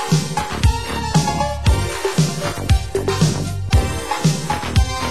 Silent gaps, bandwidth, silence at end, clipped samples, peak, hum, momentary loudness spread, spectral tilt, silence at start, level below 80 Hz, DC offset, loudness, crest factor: none; 16 kHz; 0 s; under 0.1%; -2 dBFS; none; 4 LU; -5 dB/octave; 0 s; -24 dBFS; 2%; -19 LUFS; 16 dB